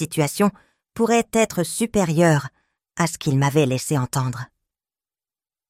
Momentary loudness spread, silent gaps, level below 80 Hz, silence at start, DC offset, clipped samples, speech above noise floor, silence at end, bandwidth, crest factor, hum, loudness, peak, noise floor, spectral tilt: 15 LU; none; -52 dBFS; 0 s; under 0.1%; under 0.1%; over 70 dB; 1.25 s; 16 kHz; 18 dB; none; -21 LUFS; -2 dBFS; under -90 dBFS; -5.5 dB/octave